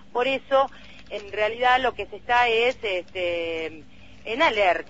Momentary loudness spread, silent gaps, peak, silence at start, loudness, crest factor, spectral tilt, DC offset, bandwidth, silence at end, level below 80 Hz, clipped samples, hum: 15 LU; none; -8 dBFS; 0.15 s; -23 LUFS; 18 dB; -3.5 dB/octave; 0.5%; 8 kHz; 0.05 s; -54 dBFS; under 0.1%; none